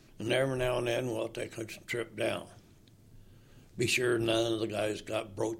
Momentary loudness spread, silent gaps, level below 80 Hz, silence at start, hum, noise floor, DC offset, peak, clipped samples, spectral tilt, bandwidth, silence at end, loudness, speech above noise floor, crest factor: 11 LU; none; -56 dBFS; 0.2 s; none; -59 dBFS; under 0.1%; -14 dBFS; under 0.1%; -4.5 dB/octave; 16.5 kHz; 0 s; -32 LUFS; 26 dB; 18 dB